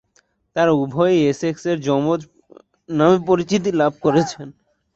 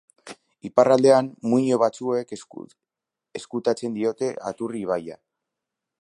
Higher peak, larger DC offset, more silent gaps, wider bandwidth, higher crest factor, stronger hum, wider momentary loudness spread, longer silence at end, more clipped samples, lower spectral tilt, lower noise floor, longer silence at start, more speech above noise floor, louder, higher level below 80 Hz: about the same, -2 dBFS vs -2 dBFS; neither; neither; second, 8 kHz vs 11.5 kHz; about the same, 18 dB vs 22 dB; neither; second, 10 LU vs 24 LU; second, 0.45 s vs 0.85 s; neither; about the same, -6.5 dB/octave vs -6 dB/octave; second, -62 dBFS vs -87 dBFS; first, 0.55 s vs 0.25 s; second, 44 dB vs 65 dB; first, -18 LUFS vs -22 LUFS; first, -58 dBFS vs -70 dBFS